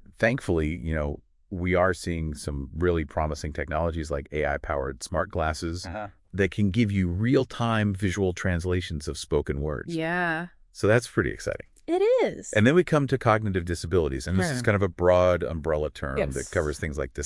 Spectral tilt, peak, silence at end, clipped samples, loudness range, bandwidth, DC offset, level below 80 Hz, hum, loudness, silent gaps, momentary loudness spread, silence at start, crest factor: -6 dB/octave; -4 dBFS; 0 s; under 0.1%; 5 LU; 12 kHz; under 0.1%; -42 dBFS; none; -26 LUFS; none; 10 LU; 0.2 s; 20 dB